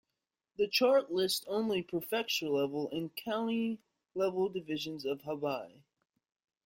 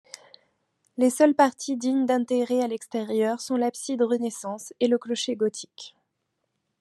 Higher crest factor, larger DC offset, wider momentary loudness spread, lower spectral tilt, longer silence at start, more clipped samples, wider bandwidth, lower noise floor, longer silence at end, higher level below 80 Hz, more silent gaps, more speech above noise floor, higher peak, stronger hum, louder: about the same, 18 dB vs 20 dB; neither; second, 10 LU vs 19 LU; about the same, -4 dB/octave vs -4 dB/octave; second, 0.6 s vs 1 s; neither; first, 16.5 kHz vs 13 kHz; first, -89 dBFS vs -78 dBFS; about the same, 1 s vs 0.9 s; first, -76 dBFS vs -84 dBFS; neither; about the same, 56 dB vs 54 dB; second, -16 dBFS vs -6 dBFS; neither; second, -33 LUFS vs -25 LUFS